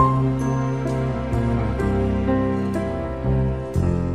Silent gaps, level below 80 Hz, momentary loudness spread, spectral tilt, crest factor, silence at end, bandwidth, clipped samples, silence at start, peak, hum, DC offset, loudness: none; -30 dBFS; 3 LU; -8.5 dB/octave; 16 dB; 0 s; 11.5 kHz; under 0.1%; 0 s; -4 dBFS; none; 0.5%; -22 LUFS